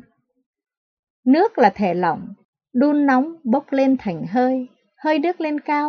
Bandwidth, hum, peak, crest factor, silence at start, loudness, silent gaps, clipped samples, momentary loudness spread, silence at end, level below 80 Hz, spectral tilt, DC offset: 6.4 kHz; none; -2 dBFS; 18 dB; 1.25 s; -19 LUFS; 2.45-2.53 s; under 0.1%; 10 LU; 0 s; -64 dBFS; -7.5 dB/octave; under 0.1%